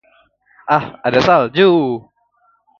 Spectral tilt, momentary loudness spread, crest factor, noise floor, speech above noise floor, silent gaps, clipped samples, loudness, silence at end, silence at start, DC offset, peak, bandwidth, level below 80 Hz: -6.5 dB/octave; 12 LU; 16 dB; -59 dBFS; 45 dB; none; under 0.1%; -14 LUFS; 0.8 s; 0.65 s; under 0.1%; 0 dBFS; 7 kHz; -52 dBFS